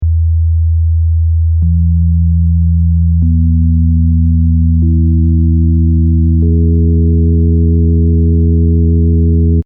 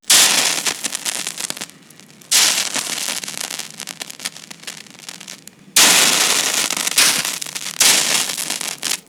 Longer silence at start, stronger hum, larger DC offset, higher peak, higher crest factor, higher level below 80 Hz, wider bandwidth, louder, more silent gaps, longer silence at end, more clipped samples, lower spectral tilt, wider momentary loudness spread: about the same, 0 s vs 0.05 s; neither; neither; about the same, 0 dBFS vs 0 dBFS; second, 8 dB vs 18 dB; first, -14 dBFS vs -64 dBFS; second, 0.5 kHz vs over 20 kHz; first, -11 LUFS vs -15 LUFS; neither; about the same, 0.05 s vs 0.1 s; neither; first, -19 dB/octave vs 1 dB/octave; second, 2 LU vs 22 LU